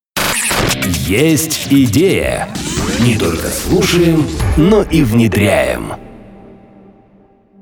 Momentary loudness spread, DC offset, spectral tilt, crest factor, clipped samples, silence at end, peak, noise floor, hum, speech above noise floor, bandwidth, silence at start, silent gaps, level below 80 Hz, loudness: 7 LU; under 0.1%; -5 dB/octave; 12 dB; under 0.1%; 1.25 s; -2 dBFS; -47 dBFS; none; 35 dB; over 20 kHz; 0.15 s; none; -28 dBFS; -13 LUFS